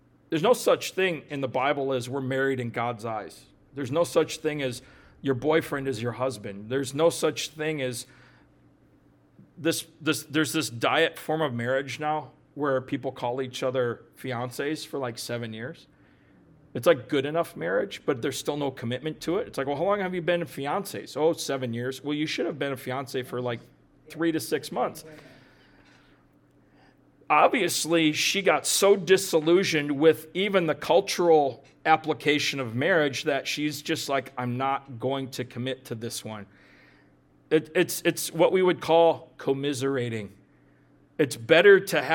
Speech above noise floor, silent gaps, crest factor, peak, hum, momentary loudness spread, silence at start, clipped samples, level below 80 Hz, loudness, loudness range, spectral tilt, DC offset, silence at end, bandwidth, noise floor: 34 dB; none; 22 dB; -4 dBFS; none; 12 LU; 0.3 s; under 0.1%; -66 dBFS; -26 LUFS; 9 LU; -4 dB/octave; under 0.1%; 0 s; 19 kHz; -60 dBFS